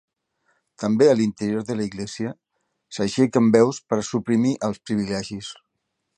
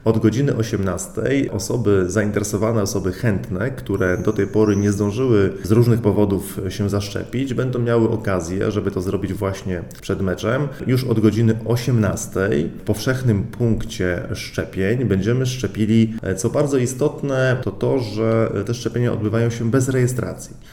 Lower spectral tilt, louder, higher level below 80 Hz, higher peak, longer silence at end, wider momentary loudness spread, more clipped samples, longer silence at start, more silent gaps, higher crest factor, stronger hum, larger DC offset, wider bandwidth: about the same, -6 dB/octave vs -6.5 dB/octave; about the same, -22 LUFS vs -20 LUFS; second, -60 dBFS vs -42 dBFS; about the same, -2 dBFS vs -2 dBFS; first, 0.65 s vs 0 s; first, 14 LU vs 7 LU; neither; first, 0.8 s vs 0.05 s; neither; about the same, 22 dB vs 18 dB; neither; neither; second, 9.8 kHz vs 17 kHz